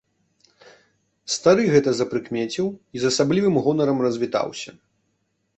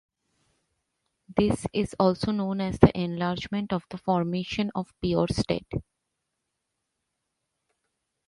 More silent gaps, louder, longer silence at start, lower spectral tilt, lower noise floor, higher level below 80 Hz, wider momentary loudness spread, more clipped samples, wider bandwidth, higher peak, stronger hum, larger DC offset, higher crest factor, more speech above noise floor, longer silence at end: neither; first, -21 LUFS vs -27 LUFS; about the same, 1.25 s vs 1.3 s; second, -5 dB/octave vs -7 dB/octave; second, -71 dBFS vs -81 dBFS; second, -60 dBFS vs -48 dBFS; about the same, 11 LU vs 10 LU; neither; second, 8.4 kHz vs 11.5 kHz; about the same, -2 dBFS vs -2 dBFS; neither; neither; second, 20 dB vs 28 dB; second, 51 dB vs 56 dB; second, 0.9 s vs 2.45 s